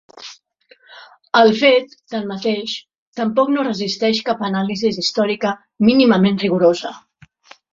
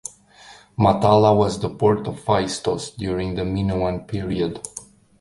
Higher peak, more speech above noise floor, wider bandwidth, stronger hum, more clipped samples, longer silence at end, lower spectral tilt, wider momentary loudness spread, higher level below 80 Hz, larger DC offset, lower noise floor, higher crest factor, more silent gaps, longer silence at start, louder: about the same, -2 dBFS vs -2 dBFS; first, 37 dB vs 27 dB; second, 7.6 kHz vs 11.5 kHz; neither; neither; first, 0.75 s vs 0.35 s; about the same, -5.5 dB/octave vs -6 dB/octave; about the same, 15 LU vs 16 LU; second, -60 dBFS vs -42 dBFS; neither; first, -53 dBFS vs -47 dBFS; about the same, 16 dB vs 18 dB; first, 2.95-3.13 s vs none; second, 0.2 s vs 0.45 s; first, -17 LUFS vs -21 LUFS